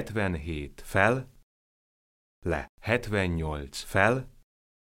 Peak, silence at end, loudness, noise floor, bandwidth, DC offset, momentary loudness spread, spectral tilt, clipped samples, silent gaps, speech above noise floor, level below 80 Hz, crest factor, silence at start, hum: -6 dBFS; 0.55 s; -29 LUFS; under -90 dBFS; 16.5 kHz; under 0.1%; 13 LU; -6 dB/octave; under 0.1%; 1.43-2.42 s, 2.69-2.78 s; over 62 dB; -46 dBFS; 24 dB; 0 s; none